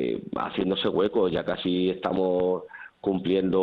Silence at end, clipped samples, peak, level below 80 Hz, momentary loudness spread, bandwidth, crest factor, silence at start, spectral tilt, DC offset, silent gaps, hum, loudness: 0 s; under 0.1%; -12 dBFS; -56 dBFS; 6 LU; 5.2 kHz; 14 dB; 0 s; -8.5 dB/octave; under 0.1%; none; none; -26 LUFS